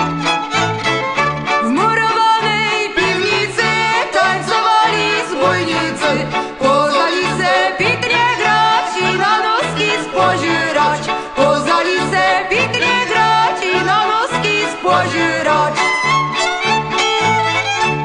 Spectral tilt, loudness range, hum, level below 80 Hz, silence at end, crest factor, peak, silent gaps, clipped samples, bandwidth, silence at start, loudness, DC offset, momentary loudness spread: -3.5 dB/octave; 1 LU; none; -48 dBFS; 0 s; 14 dB; -2 dBFS; none; under 0.1%; 11 kHz; 0 s; -14 LUFS; under 0.1%; 3 LU